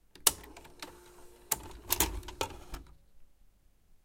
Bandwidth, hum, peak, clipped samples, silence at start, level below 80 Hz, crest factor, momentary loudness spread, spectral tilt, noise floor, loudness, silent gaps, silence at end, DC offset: 17 kHz; none; -6 dBFS; under 0.1%; 0.15 s; -50 dBFS; 32 dB; 21 LU; -1 dB/octave; -62 dBFS; -32 LUFS; none; 0.1 s; under 0.1%